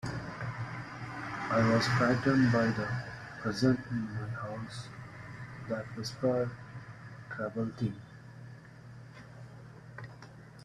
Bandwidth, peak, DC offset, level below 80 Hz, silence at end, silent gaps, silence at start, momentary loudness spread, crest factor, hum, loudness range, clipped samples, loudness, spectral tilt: 12 kHz; -14 dBFS; under 0.1%; -60 dBFS; 0 s; none; 0 s; 23 LU; 20 dB; none; 12 LU; under 0.1%; -32 LUFS; -6.5 dB/octave